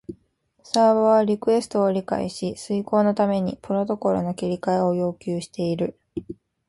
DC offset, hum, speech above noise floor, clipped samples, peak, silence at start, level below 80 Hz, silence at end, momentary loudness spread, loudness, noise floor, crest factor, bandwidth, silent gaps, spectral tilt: under 0.1%; none; 43 dB; under 0.1%; -2 dBFS; 0.1 s; -58 dBFS; 0.35 s; 11 LU; -23 LUFS; -65 dBFS; 20 dB; 11.5 kHz; none; -6.5 dB/octave